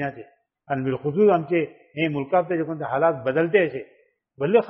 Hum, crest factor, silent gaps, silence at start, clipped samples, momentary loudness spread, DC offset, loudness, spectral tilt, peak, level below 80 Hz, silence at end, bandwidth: none; 18 dB; none; 0 s; under 0.1%; 11 LU; under 0.1%; -23 LUFS; -5.5 dB/octave; -4 dBFS; -66 dBFS; 0 s; 5.4 kHz